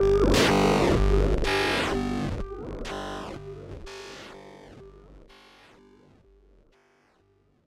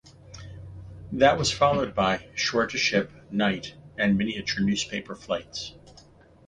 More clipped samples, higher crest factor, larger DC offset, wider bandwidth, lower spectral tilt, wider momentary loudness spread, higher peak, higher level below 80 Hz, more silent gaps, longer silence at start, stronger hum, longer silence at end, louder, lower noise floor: neither; about the same, 18 dB vs 22 dB; neither; first, 16 kHz vs 10 kHz; about the same, -5 dB/octave vs -4.5 dB/octave; about the same, 22 LU vs 21 LU; second, -10 dBFS vs -6 dBFS; first, -34 dBFS vs -50 dBFS; neither; about the same, 0 s vs 0.05 s; neither; first, 2.5 s vs 0.75 s; about the same, -25 LUFS vs -25 LUFS; first, -65 dBFS vs -53 dBFS